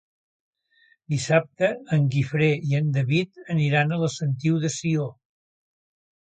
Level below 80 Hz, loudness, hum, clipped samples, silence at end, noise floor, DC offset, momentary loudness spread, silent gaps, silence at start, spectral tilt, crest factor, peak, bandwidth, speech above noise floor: -62 dBFS; -24 LUFS; none; under 0.1%; 1.1 s; -62 dBFS; under 0.1%; 6 LU; none; 1.1 s; -6 dB/octave; 20 dB; -6 dBFS; 9.2 kHz; 39 dB